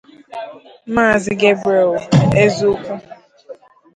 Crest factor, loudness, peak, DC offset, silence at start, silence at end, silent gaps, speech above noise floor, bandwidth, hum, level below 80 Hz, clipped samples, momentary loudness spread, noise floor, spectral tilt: 16 dB; -15 LUFS; 0 dBFS; under 0.1%; 0.3 s; 0.45 s; none; 24 dB; 9.4 kHz; none; -46 dBFS; under 0.1%; 18 LU; -39 dBFS; -6.5 dB/octave